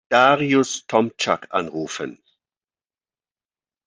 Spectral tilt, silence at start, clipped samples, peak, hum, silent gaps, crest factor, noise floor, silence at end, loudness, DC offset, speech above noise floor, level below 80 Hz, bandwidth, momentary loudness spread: -4 dB/octave; 0.1 s; under 0.1%; -2 dBFS; none; none; 20 dB; under -90 dBFS; 1.7 s; -20 LUFS; under 0.1%; over 70 dB; -68 dBFS; 10 kHz; 14 LU